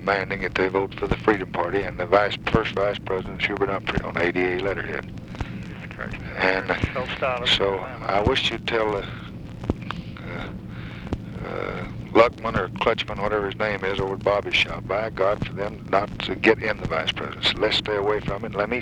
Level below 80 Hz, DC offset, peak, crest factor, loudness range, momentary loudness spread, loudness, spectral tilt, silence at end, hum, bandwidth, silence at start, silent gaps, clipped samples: -42 dBFS; under 0.1%; -2 dBFS; 22 dB; 3 LU; 13 LU; -24 LUFS; -5.5 dB/octave; 0 s; none; 11.5 kHz; 0 s; none; under 0.1%